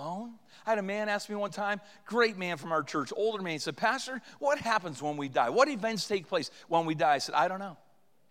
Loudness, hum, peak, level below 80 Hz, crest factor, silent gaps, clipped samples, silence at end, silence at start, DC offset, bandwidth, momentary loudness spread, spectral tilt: -31 LUFS; none; -10 dBFS; -80 dBFS; 22 dB; none; under 0.1%; 0.55 s; 0 s; under 0.1%; 16.5 kHz; 9 LU; -4 dB/octave